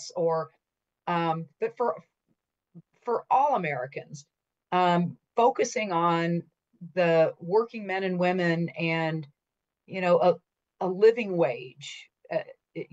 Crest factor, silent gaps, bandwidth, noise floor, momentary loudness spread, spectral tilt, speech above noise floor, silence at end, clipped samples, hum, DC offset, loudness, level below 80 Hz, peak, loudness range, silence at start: 18 dB; none; 8 kHz; -86 dBFS; 17 LU; -6 dB/octave; 60 dB; 0.1 s; under 0.1%; none; under 0.1%; -27 LUFS; -78 dBFS; -10 dBFS; 4 LU; 0 s